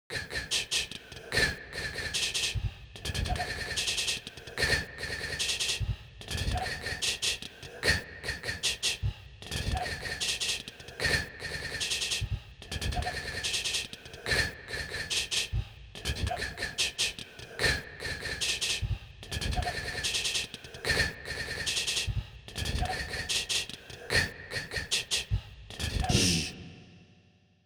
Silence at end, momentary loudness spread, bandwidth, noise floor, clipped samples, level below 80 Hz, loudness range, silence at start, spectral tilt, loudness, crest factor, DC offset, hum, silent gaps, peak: 0.5 s; 10 LU; over 20 kHz; -63 dBFS; under 0.1%; -42 dBFS; 1 LU; 0.1 s; -2 dB/octave; -31 LUFS; 22 dB; under 0.1%; none; none; -10 dBFS